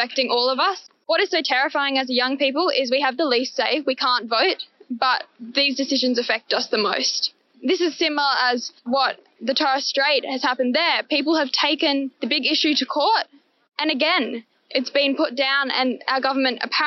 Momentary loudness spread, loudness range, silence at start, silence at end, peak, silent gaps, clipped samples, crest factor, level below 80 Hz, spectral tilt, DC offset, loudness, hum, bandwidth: 6 LU; 2 LU; 0 s; 0 s; -4 dBFS; none; under 0.1%; 16 dB; -78 dBFS; 1.5 dB/octave; under 0.1%; -20 LUFS; none; 6.2 kHz